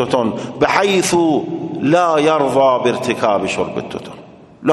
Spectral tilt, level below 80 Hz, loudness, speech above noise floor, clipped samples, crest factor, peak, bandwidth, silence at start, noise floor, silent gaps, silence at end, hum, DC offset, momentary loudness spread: -4.5 dB/octave; -52 dBFS; -16 LUFS; 24 dB; under 0.1%; 16 dB; 0 dBFS; 12.5 kHz; 0 s; -39 dBFS; none; 0 s; none; under 0.1%; 11 LU